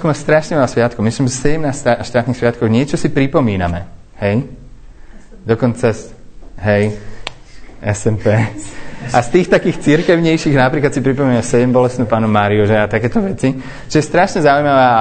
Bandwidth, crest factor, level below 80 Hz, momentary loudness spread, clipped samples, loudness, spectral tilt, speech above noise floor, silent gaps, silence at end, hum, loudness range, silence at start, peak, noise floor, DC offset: 9.2 kHz; 14 dB; -36 dBFS; 10 LU; under 0.1%; -14 LUFS; -6.5 dB/octave; 21 dB; none; 0 s; none; 6 LU; 0 s; 0 dBFS; -35 dBFS; under 0.1%